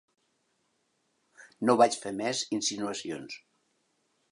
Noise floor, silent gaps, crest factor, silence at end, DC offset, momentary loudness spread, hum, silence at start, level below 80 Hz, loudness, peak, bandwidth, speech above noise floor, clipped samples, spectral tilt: -75 dBFS; none; 24 dB; 0.95 s; under 0.1%; 16 LU; none; 1.4 s; -76 dBFS; -29 LUFS; -8 dBFS; 11.5 kHz; 46 dB; under 0.1%; -3 dB/octave